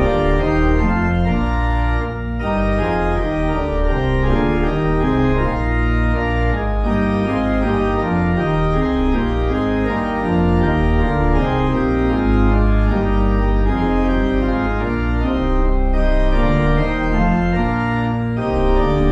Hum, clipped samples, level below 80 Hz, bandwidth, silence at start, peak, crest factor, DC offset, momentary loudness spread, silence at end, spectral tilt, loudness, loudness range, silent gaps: none; under 0.1%; -20 dBFS; 7.4 kHz; 0 s; -2 dBFS; 14 dB; under 0.1%; 3 LU; 0 s; -8.5 dB/octave; -18 LUFS; 2 LU; none